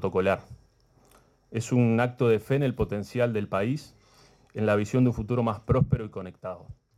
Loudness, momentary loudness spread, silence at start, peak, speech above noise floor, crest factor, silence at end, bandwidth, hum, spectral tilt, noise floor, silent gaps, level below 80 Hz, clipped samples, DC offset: -27 LUFS; 14 LU; 0 s; -12 dBFS; 35 dB; 16 dB; 0.25 s; 13.5 kHz; none; -7.5 dB/octave; -61 dBFS; none; -48 dBFS; under 0.1%; under 0.1%